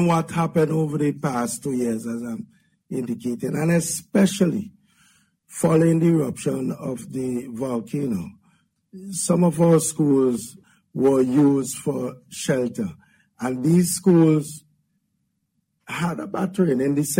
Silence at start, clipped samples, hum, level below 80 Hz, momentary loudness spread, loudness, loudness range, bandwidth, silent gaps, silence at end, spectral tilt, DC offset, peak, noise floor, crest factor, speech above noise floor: 0 s; under 0.1%; none; -60 dBFS; 14 LU; -22 LUFS; 5 LU; 16.5 kHz; none; 0 s; -6 dB/octave; under 0.1%; -6 dBFS; -73 dBFS; 16 dB; 52 dB